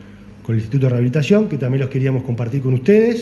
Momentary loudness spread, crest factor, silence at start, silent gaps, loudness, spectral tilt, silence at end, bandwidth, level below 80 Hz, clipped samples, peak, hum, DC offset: 8 LU; 14 dB; 0 s; none; -17 LUFS; -8.5 dB/octave; 0 s; 11 kHz; -50 dBFS; under 0.1%; -2 dBFS; none; under 0.1%